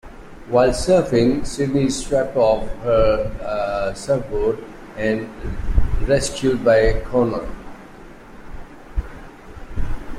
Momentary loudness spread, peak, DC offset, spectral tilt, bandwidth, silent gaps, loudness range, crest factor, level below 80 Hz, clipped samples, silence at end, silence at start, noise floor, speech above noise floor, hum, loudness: 24 LU; -2 dBFS; under 0.1%; -5.5 dB/octave; 12.5 kHz; none; 4 LU; 16 dB; -28 dBFS; under 0.1%; 0 s; 0.05 s; -40 dBFS; 22 dB; none; -20 LUFS